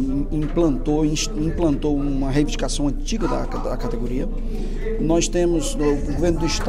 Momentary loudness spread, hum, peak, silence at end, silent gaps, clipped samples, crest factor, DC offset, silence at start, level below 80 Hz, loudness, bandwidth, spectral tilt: 7 LU; none; -6 dBFS; 0 s; none; under 0.1%; 14 dB; under 0.1%; 0 s; -24 dBFS; -22 LUFS; 12 kHz; -5.5 dB/octave